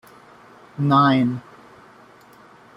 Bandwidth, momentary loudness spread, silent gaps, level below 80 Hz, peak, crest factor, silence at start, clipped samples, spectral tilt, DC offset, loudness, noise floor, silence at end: 7 kHz; 19 LU; none; -64 dBFS; -4 dBFS; 18 dB; 0.8 s; under 0.1%; -8 dB/octave; under 0.1%; -18 LUFS; -49 dBFS; 1.35 s